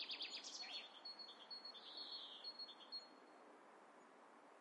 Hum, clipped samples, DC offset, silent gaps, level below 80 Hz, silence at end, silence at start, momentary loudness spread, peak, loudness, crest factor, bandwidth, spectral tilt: none; under 0.1%; under 0.1%; none; under -90 dBFS; 0 s; 0 s; 17 LU; -38 dBFS; -52 LUFS; 18 dB; 11 kHz; 0.5 dB/octave